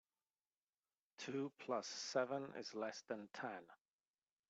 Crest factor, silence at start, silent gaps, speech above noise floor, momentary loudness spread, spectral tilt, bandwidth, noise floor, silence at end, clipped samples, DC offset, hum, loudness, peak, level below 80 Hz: 20 dB; 1.2 s; none; over 44 dB; 9 LU; -3.5 dB/octave; 8.2 kHz; under -90 dBFS; 0.75 s; under 0.1%; under 0.1%; none; -46 LUFS; -28 dBFS; under -90 dBFS